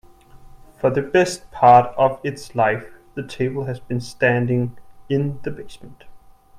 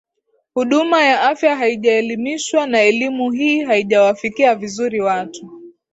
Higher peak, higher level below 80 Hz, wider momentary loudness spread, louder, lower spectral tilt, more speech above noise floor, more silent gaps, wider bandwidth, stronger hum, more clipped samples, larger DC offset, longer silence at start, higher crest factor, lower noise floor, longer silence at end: about the same, 0 dBFS vs -2 dBFS; first, -50 dBFS vs -64 dBFS; first, 19 LU vs 8 LU; second, -19 LUFS vs -16 LUFS; first, -6.5 dB/octave vs -3.5 dB/octave; second, 25 dB vs 50 dB; neither; first, 13 kHz vs 8 kHz; neither; neither; neither; about the same, 0.45 s vs 0.55 s; first, 20 dB vs 14 dB; second, -44 dBFS vs -66 dBFS; first, 0.4 s vs 0.25 s